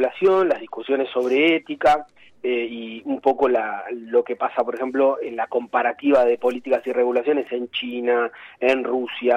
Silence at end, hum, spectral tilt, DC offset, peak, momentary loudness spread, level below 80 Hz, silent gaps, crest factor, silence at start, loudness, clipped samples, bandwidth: 0 s; none; -5 dB/octave; under 0.1%; -6 dBFS; 8 LU; -60 dBFS; none; 16 dB; 0 s; -21 LUFS; under 0.1%; 9 kHz